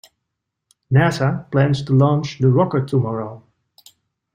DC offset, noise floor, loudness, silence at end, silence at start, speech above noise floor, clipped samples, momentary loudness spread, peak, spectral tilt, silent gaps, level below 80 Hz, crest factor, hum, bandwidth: under 0.1%; -79 dBFS; -18 LUFS; 0.95 s; 0.9 s; 62 dB; under 0.1%; 7 LU; -4 dBFS; -8 dB/octave; none; -52 dBFS; 16 dB; none; 9.6 kHz